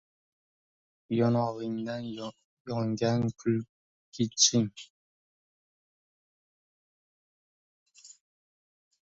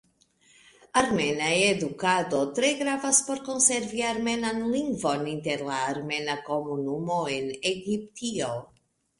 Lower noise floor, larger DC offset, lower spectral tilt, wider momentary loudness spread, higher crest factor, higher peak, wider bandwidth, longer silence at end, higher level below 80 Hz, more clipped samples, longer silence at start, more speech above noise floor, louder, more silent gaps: first, under -90 dBFS vs -63 dBFS; neither; about the same, -4 dB/octave vs -3 dB/octave; first, 21 LU vs 9 LU; about the same, 26 dB vs 22 dB; about the same, -8 dBFS vs -6 dBFS; second, 7.8 kHz vs 11.5 kHz; first, 0.9 s vs 0.55 s; second, -68 dBFS vs -62 dBFS; neither; first, 1.1 s vs 0.95 s; first, over 61 dB vs 36 dB; second, -29 LUFS vs -26 LUFS; first, 2.44-2.65 s, 3.69-4.12 s, 4.90-7.86 s vs none